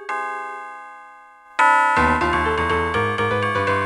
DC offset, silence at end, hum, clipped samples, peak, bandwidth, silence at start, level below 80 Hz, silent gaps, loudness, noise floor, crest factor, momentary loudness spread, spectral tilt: under 0.1%; 0 s; none; under 0.1%; -4 dBFS; 12 kHz; 0 s; -38 dBFS; none; -19 LUFS; -45 dBFS; 18 dB; 18 LU; -5 dB/octave